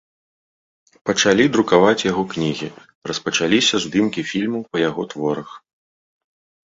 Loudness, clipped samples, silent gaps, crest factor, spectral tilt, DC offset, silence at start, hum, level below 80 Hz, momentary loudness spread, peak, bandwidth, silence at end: -19 LUFS; under 0.1%; 2.95-3.02 s; 18 dB; -4 dB/octave; under 0.1%; 1.05 s; none; -56 dBFS; 14 LU; -2 dBFS; 8 kHz; 1.1 s